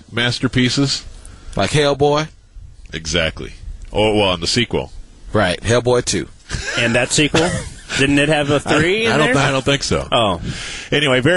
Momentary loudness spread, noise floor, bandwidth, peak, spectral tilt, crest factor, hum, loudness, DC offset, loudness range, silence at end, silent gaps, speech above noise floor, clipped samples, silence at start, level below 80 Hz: 12 LU; -38 dBFS; 11.5 kHz; -2 dBFS; -4 dB/octave; 14 dB; none; -16 LUFS; under 0.1%; 4 LU; 0 s; none; 22 dB; under 0.1%; 0.1 s; -36 dBFS